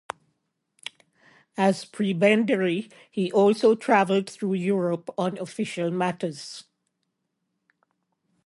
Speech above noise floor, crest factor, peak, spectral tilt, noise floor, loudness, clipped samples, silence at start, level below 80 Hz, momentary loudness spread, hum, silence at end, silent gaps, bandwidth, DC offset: 55 dB; 18 dB; -8 dBFS; -6 dB/octave; -78 dBFS; -24 LUFS; under 0.1%; 1.55 s; -74 dBFS; 20 LU; none; 1.85 s; none; 11.5 kHz; under 0.1%